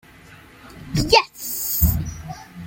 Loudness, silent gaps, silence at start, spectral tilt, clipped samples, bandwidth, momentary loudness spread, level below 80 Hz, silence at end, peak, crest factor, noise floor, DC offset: -20 LUFS; none; 0.3 s; -4 dB/octave; under 0.1%; 17 kHz; 20 LU; -32 dBFS; 0 s; -2 dBFS; 22 dB; -46 dBFS; under 0.1%